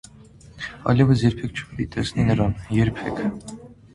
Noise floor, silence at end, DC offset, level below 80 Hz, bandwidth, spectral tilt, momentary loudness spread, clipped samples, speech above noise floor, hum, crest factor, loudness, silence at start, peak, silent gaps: -47 dBFS; 0.2 s; under 0.1%; -40 dBFS; 11 kHz; -7 dB/octave; 17 LU; under 0.1%; 26 dB; none; 18 dB; -22 LUFS; 0.45 s; -4 dBFS; none